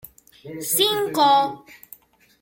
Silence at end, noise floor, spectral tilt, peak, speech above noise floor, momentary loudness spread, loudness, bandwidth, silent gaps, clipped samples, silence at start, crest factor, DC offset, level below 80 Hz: 0.7 s; -49 dBFS; -2 dB/octave; -4 dBFS; 29 dB; 19 LU; -19 LUFS; 17 kHz; none; under 0.1%; 0.45 s; 18 dB; under 0.1%; -66 dBFS